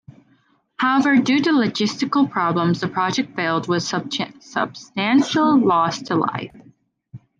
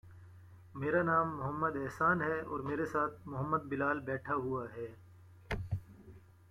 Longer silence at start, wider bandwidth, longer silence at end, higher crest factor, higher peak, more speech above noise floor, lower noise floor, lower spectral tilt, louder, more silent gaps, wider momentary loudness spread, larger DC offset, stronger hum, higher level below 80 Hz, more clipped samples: first, 0.8 s vs 0.05 s; second, 9.2 kHz vs 15.5 kHz; about the same, 0.2 s vs 0.3 s; about the same, 14 dB vs 18 dB; first, -6 dBFS vs -18 dBFS; first, 41 dB vs 22 dB; about the same, -60 dBFS vs -57 dBFS; second, -5 dB/octave vs -8 dB/octave; first, -19 LUFS vs -35 LUFS; neither; second, 9 LU vs 12 LU; neither; neither; second, -66 dBFS vs -60 dBFS; neither